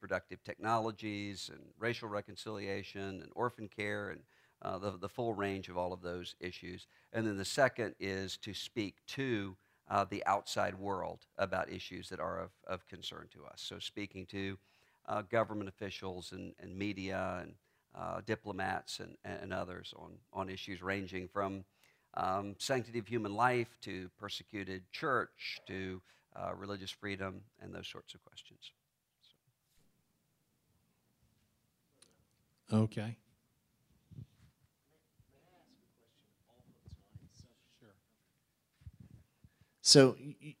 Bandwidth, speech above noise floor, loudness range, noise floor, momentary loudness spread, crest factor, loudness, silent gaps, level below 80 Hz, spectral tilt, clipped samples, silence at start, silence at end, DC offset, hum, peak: 16 kHz; 41 dB; 7 LU; -79 dBFS; 16 LU; 30 dB; -38 LUFS; none; -72 dBFS; -4 dB/octave; under 0.1%; 0 s; 0.05 s; under 0.1%; none; -10 dBFS